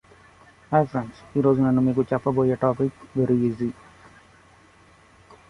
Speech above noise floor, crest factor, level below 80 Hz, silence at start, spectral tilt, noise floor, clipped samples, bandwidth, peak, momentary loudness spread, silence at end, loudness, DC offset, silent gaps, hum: 32 dB; 20 dB; -56 dBFS; 0.7 s; -10 dB/octave; -54 dBFS; under 0.1%; 10.5 kHz; -4 dBFS; 10 LU; 1.8 s; -23 LUFS; under 0.1%; none; none